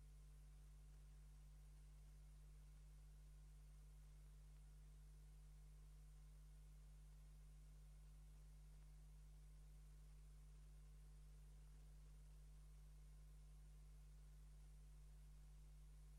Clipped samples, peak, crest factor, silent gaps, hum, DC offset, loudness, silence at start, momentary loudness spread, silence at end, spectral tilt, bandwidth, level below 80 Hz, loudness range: under 0.1%; -56 dBFS; 6 dB; none; 50 Hz at -65 dBFS; under 0.1%; -67 LUFS; 0 s; 0 LU; 0 s; -5.5 dB/octave; 12.5 kHz; -64 dBFS; 0 LU